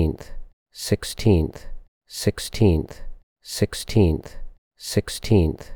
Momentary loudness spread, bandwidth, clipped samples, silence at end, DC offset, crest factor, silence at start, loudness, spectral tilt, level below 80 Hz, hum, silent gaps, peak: 18 LU; 19.5 kHz; under 0.1%; 0 s; under 0.1%; 16 dB; 0 s; -23 LUFS; -6 dB/octave; -34 dBFS; none; 0.53-0.66 s, 1.88-2.01 s, 3.23-3.36 s, 4.58-4.71 s; -6 dBFS